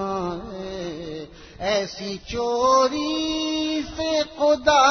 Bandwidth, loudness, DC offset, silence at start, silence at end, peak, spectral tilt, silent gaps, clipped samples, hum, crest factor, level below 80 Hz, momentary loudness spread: 6.6 kHz; -23 LUFS; under 0.1%; 0 s; 0 s; -4 dBFS; -3.5 dB/octave; none; under 0.1%; none; 18 dB; -48 dBFS; 15 LU